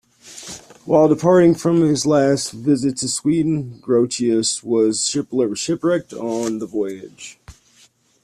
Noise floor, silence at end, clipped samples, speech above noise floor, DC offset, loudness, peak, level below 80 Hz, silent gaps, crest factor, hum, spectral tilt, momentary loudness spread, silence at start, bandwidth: -55 dBFS; 0.7 s; under 0.1%; 37 dB; under 0.1%; -18 LUFS; -2 dBFS; -56 dBFS; none; 16 dB; none; -5 dB/octave; 20 LU; 0.25 s; 14 kHz